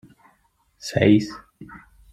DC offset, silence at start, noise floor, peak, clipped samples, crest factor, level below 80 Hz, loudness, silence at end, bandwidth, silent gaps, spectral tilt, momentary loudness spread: under 0.1%; 0.85 s; -64 dBFS; -4 dBFS; under 0.1%; 20 dB; -52 dBFS; -19 LUFS; 0.35 s; 13.5 kHz; none; -6.5 dB/octave; 26 LU